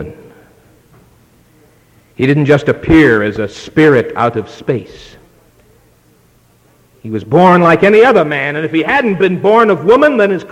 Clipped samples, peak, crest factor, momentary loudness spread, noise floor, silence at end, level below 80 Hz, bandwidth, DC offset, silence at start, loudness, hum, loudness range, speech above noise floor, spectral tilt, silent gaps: under 0.1%; 0 dBFS; 12 dB; 13 LU; -50 dBFS; 0.05 s; -40 dBFS; 11 kHz; under 0.1%; 0 s; -10 LUFS; none; 7 LU; 39 dB; -7.5 dB/octave; none